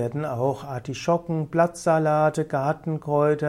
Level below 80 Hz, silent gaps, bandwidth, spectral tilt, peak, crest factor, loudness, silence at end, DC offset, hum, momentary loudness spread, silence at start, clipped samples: -58 dBFS; none; 13 kHz; -7 dB/octave; -8 dBFS; 16 dB; -24 LUFS; 0 s; under 0.1%; none; 8 LU; 0 s; under 0.1%